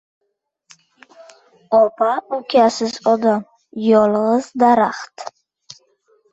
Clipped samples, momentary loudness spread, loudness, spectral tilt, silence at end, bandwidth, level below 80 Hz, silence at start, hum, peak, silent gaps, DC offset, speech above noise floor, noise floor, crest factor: under 0.1%; 17 LU; -16 LUFS; -5 dB/octave; 1.05 s; 8.2 kHz; -64 dBFS; 1.7 s; none; -2 dBFS; none; under 0.1%; 55 dB; -70 dBFS; 16 dB